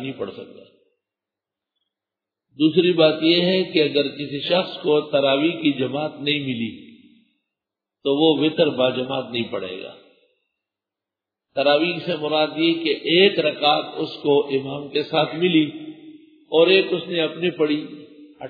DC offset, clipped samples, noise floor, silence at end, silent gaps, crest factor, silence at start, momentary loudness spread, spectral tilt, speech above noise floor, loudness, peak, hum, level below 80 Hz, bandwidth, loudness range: under 0.1%; under 0.1%; -87 dBFS; 0 s; none; 20 dB; 0 s; 13 LU; -8 dB/octave; 67 dB; -20 LUFS; -2 dBFS; none; -70 dBFS; 5 kHz; 5 LU